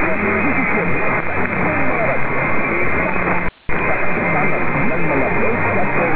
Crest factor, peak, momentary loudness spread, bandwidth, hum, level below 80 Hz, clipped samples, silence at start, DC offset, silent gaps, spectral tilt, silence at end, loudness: 12 dB; -4 dBFS; 2 LU; 4 kHz; none; -36 dBFS; under 0.1%; 0 s; under 0.1%; none; -10 dB/octave; 0 s; -17 LUFS